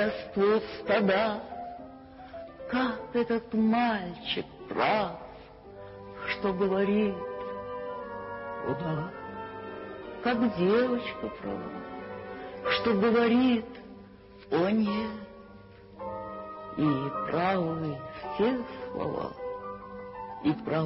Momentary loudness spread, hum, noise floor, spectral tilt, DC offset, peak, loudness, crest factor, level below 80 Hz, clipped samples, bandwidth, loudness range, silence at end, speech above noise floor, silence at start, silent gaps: 19 LU; none; -50 dBFS; -10 dB/octave; under 0.1%; -12 dBFS; -30 LUFS; 18 dB; -58 dBFS; under 0.1%; 5.8 kHz; 5 LU; 0 s; 22 dB; 0 s; none